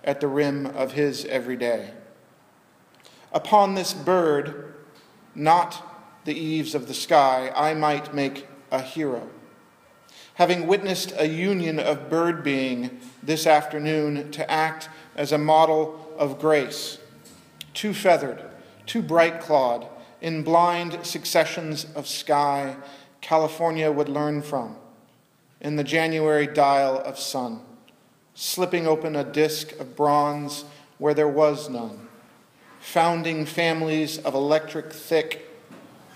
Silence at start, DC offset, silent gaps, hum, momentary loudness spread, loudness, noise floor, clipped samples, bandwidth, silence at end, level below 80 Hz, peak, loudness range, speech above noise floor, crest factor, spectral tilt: 0.05 s; under 0.1%; none; none; 15 LU; -23 LUFS; -60 dBFS; under 0.1%; 15.5 kHz; 0.35 s; -78 dBFS; -4 dBFS; 3 LU; 37 dB; 20 dB; -4.5 dB/octave